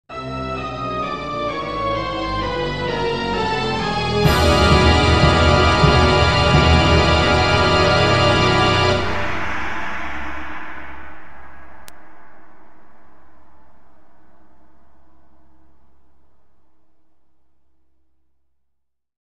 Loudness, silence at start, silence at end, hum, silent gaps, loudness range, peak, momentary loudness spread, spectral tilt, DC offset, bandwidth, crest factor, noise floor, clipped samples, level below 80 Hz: -17 LUFS; 0.05 s; 0.05 s; none; none; 16 LU; 0 dBFS; 14 LU; -5.5 dB/octave; 2%; 13.5 kHz; 18 dB; -73 dBFS; under 0.1%; -28 dBFS